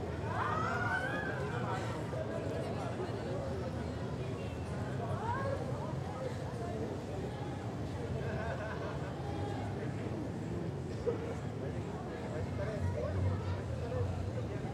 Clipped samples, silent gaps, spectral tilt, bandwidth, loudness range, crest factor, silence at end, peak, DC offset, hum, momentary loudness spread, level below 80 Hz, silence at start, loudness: under 0.1%; none; -7 dB/octave; 12.5 kHz; 2 LU; 16 dB; 0 s; -22 dBFS; under 0.1%; none; 5 LU; -52 dBFS; 0 s; -38 LUFS